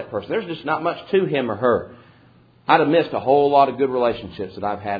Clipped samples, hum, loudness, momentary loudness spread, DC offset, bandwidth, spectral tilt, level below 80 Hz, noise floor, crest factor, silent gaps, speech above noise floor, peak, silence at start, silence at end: under 0.1%; none; -20 LUFS; 12 LU; under 0.1%; 5 kHz; -8.5 dB/octave; -56 dBFS; -52 dBFS; 20 dB; none; 33 dB; -2 dBFS; 0 s; 0 s